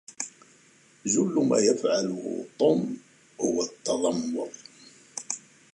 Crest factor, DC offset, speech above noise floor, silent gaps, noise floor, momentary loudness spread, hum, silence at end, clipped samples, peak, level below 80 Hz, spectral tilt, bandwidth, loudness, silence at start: 18 dB; under 0.1%; 33 dB; none; -58 dBFS; 15 LU; none; 0.35 s; under 0.1%; -10 dBFS; -70 dBFS; -4.5 dB/octave; 11.5 kHz; -27 LUFS; 0.1 s